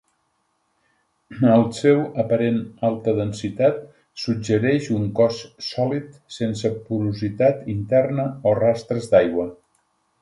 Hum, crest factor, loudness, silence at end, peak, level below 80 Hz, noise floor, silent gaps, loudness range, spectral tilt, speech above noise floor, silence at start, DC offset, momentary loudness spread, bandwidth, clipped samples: none; 20 dB; -21 LUFS; 0.7 s; -2 dBFS; -54 dBFS; -69 dBFS; none; 2 LU; -7 dB/octave; 49 dB; 1.3 s; under 0.1%; 10 LU; 11.5 kHz; under 0.1%